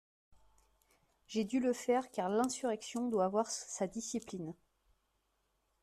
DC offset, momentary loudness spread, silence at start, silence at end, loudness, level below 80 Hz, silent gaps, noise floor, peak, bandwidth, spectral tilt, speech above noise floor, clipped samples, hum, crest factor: under 0.1%; 8 LU; 0.3 s; 1.3 s; -36 LUFS; -74 dBFS; none; -80 dBFS; -20 dBFS; 14 kHz; -4.5 dB/octave; 44 dB; under 0.1%; none; 18 dB